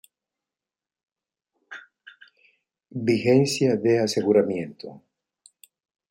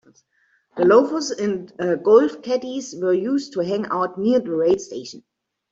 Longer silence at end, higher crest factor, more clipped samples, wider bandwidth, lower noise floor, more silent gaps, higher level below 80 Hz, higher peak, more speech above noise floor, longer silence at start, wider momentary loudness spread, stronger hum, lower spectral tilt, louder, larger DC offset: first, 1.1 s vs 0.5 s; about the same, 20 dB vs 18 dB; neither; first, 16.5 kHz vs 7.8 kHz; first, under -90 dBFS vs -64 dBFS; neither; second, -70 dBFS vs -64 dBFS; second, -8 dBFS vs -2 dBFS; first, over 68 dB vs 45 dB; first, 1.7 s vs 0.75 s; first, 23 LU vs 12 LU; neither; about the same, -5.5 dB/octave vs -5.5 dB/octave; about the same, -22 LUFS vs -20 LUFS; neither